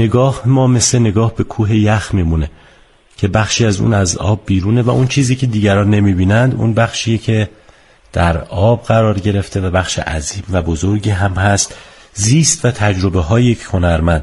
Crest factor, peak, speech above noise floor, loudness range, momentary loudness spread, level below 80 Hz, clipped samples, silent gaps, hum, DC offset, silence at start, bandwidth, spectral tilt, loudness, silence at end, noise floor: 14 dB; 0 dBFS; 34 dB; 3 LU; 6 LU; -30 dBFS; under 0.1%; none; none; under 0.1%; 0 s; 11.5 kHz; -5.5 dB/octave; -14 LUFS; 0 s; -47 dBFS